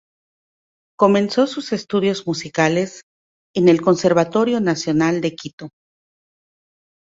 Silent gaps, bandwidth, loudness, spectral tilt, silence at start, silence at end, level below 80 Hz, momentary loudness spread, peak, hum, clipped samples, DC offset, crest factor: 3.03-3.54 s, 5.53-5.58 s; 7.8 kHz; -18 LUFS; -5.5 dB/octave; 1 s; 1.35 s; -60 dBFS; 13 LU; -2 dBFS; none; under 0.1%; under 0.1%; 18 dB